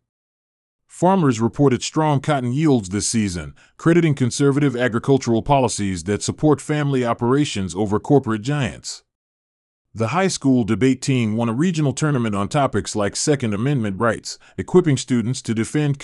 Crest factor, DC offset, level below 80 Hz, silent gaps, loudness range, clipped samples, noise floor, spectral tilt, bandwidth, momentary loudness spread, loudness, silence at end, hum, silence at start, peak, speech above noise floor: 18 dB; under 0.1%; -50 dBFS; 9.15-9.85 s; 3 LU; under 0.1%; under -90 dBFS; -5.5 dB/octave; 12 kHz; 6 LU; -19 LUFS; 0 s; none; 0.95 s; -2 dBFS; over 71 dB